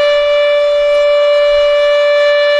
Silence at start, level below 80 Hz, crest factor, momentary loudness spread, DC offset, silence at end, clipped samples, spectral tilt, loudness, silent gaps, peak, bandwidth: 0 s; -44 dBFS; 6 dB; 1 LU; under 0.1%; 0 s; under 0.1%; -0.5 dB/octave; -10 LUFS; none; -4 dBFS; 8.6 kHz